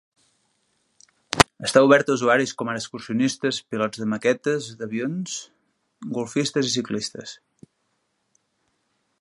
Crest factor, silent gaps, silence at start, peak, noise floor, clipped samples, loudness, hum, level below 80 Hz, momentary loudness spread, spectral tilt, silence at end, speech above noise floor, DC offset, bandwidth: 24 dB; none; 1.3 s; 0 dBFS; -72 dBFS; under 0.1%; -23 LUFS; none; -52 dBFS; 15 LU; -4 dB/octave; 1.85 s; 49 dB; under 0.1%; 16 kHz